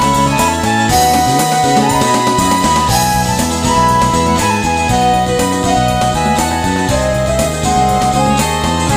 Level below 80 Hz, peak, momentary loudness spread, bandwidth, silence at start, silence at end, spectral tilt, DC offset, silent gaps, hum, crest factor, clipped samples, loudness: -26 dBFS; 0 dBFS; 3 LU; 15.5 kHz; 0 s; 0 s; -4 dB/octave; under 0.1%; none; none; 12 dB; under 0.1%; -12 LUFS